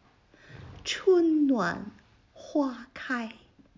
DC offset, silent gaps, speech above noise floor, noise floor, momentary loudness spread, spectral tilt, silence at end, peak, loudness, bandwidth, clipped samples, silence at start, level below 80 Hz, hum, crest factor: under 0.1%; none; 28 dB; -58 dBFS; 20 LU; -5 dB/octave; 0.45 s; -14 dBFS; -28 LUFS; 7.6 kHz; under 0.1%; 0.5 s; -62 dBFS; none; 16 dB